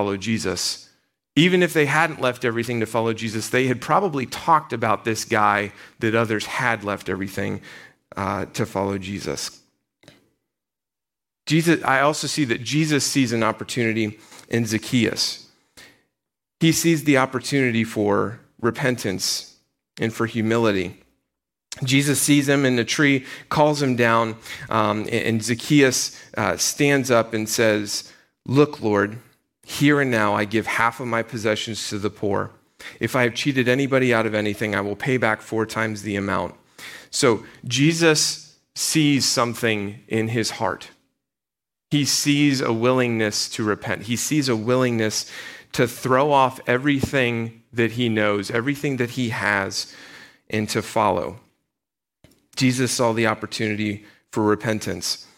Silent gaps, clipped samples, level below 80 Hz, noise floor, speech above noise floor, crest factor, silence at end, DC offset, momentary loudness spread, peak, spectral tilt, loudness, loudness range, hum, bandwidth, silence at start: none; under 0.1%; -58 dBFS; -88 dBFS; 67 dB; 18 dB; 0.15 s; under 0.1%; 10 LU; -4 dBFS; -4.5 dB/octave; -21 LUFS; 4 LU; none; 16.5 kHz; 0 s